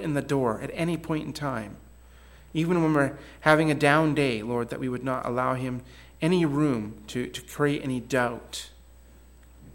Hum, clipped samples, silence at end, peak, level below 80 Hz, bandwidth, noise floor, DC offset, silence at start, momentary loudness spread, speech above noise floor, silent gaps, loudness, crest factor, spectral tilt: none; under 0.1%; 0 s; -6 dBFS; -52 dBFS; 17 kHz; -51 dBFS; under 0.1%; 0 s; 13 LU; 25 dB; none; -26 LUFS; 22 dB; -6 dB/octave